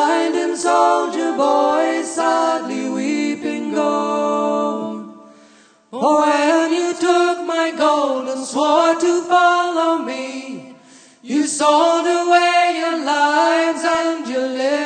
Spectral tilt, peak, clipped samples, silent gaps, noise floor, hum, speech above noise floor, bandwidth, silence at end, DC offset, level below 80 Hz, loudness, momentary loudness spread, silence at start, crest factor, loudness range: -3 dB/octave; -2 dBFS; under 0.1%; none; -49 dBFS; none; 34 dB; 9.4 kHz; 0 s; under 0.1%; -72 dBFS; -17 LUFS; 9 LU; 0 s; 16 dB; 4 LU